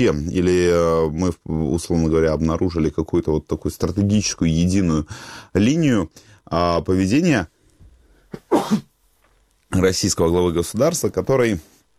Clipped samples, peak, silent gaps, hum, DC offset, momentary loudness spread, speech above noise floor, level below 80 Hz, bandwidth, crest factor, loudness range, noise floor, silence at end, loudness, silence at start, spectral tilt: under 0.1%; -4 dBFS; none; none; under 0.1%; 8 LU; 41 dB; -38 dBFS; 15.5 kHz; 16 dB; 3 LU; -60 dBFS; 0.4 s; -20 LUFS; 0 s; -5.5 dB/octave